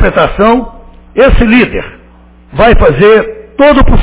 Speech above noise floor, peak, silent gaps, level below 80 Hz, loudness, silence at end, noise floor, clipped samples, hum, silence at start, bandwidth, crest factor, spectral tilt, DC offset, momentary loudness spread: 32 dB; 0 dBFS; none; -16 dBFS; -7 LUFS; 0 s; -37 dBFS; 3%; none; 0 s; 4 kHz; 6 dB; -10.5 dB/octave; under 0.1%; 14 LU